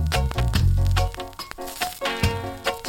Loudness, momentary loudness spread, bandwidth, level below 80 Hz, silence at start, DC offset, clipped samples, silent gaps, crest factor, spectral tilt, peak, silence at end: -25 LUFS; 13 LU; 17.5 kHz; -28 dBFS; 0 s; under 0.1%; under 0.1%; none; 16 dB; -5 dB/octave; -8 dBFS; 0 s